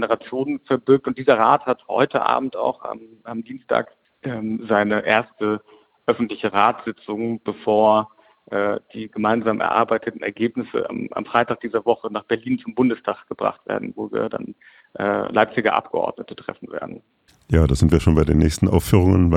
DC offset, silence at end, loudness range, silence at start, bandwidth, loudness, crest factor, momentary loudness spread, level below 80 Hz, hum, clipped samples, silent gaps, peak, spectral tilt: under 0.1%; 0 s; 4 LU; 0 s; 16 kHz; -21 LUFS; 20 dB; 15 LU; -36 dBFS; none; under 0.1%; none; -2 dBFS; -7 dB/octave